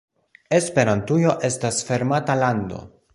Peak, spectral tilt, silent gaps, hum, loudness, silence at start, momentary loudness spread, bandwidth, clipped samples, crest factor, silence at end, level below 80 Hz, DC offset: -4 dBFS; -5.5 dB/octave; none; none; -21 LUFS; 0.5 s; 6 LU; 11.5 kHz; under 0.1%; 18 dB; 0.3 s; -52 dBFS; under 0.1%